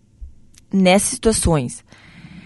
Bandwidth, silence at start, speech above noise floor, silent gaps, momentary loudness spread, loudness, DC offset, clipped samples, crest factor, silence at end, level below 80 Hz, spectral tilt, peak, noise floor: 12 kHz; 0.2 s; 22 dB; none; 13 LU; -17 LUFS; under 0.1%; under 0.1%; 18 dB; 0.05 s; -34 dBFS; -4.5 dB/octave; -2 dBFS; -40 dBFS